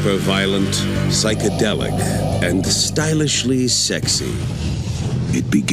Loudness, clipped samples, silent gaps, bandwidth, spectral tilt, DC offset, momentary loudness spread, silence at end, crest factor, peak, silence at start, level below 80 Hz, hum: -18 LUFS; under 0.1%; none; 16 kHz; -4 dB/octave; under 0.1%; 7 LU; 0 s; 16 dB; -2 dBFS; 0 s; -34 dBFS; none